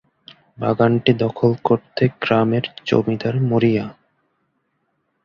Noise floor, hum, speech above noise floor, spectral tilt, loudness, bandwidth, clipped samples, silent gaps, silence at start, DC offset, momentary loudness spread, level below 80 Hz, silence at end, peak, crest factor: -70 dBFS; none; 52 dB; -8.5 dB/octave; -19 LUFS; 7 kHz; under 0.1%; none; 0.6 s; under 0.1%; 6 LU; -54 dBFS; 1.35 s; -2 dBFS; 18 dB